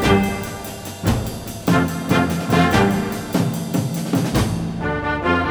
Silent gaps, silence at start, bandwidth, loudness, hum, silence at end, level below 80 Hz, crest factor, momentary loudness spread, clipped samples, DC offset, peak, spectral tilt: none; 0 s; over 20 kHz; -20 LUFS; none; 0 s; -36 dBFS; 18 dB; 9 LU; under 0.1%; under 0.1%; -2 dBFS; -5.5 dB/octave